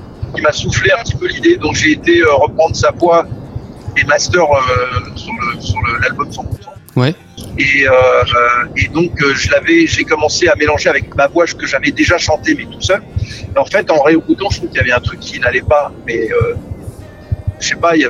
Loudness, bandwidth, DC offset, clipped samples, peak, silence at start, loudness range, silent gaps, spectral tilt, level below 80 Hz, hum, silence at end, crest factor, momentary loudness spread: -12 LUFS; 12 kHz; under 0.1%; under 0.1%; 0 dBFS; 0 s; 4 LU; none; -4.5 dB/octave; -32 dBFS; none; 0 s; 12 dB; 12 LU